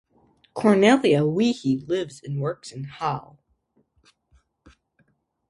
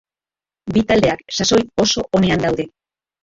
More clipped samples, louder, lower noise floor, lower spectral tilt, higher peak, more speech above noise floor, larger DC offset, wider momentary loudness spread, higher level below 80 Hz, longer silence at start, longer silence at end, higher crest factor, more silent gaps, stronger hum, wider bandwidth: neither; second, -22 LUFS vs -17 LUFS; second, -67 dBFS vs under -90 dBFS; first, -6 dB/octave vs -4.5 dB/octave; about the same, -4 dBFS vs -2 dBFS; second, 46 dB vs over 74 dB; neither; first, 17 LU vs 8 LU; second, -62 dBFS vs -42 dBFS; about the same, 0.55 s vs 0.65 s; first, 2.3 s vs 0.55 s; about the same, 22 dB vs 18 dB; neither; neither; first, 11.5 kHz vs 7.8 kHz